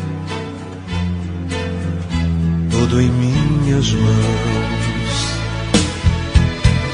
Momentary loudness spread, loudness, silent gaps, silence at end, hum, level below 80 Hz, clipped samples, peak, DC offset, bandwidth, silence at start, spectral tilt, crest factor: 9 LU; -18 LUFS; none; 0 s; none; -26 dBFS; under 0.1%; 0 dBFS; under 0.1%; 10.5 kHz; 0 s; -5.5 dB/octave; 16 dB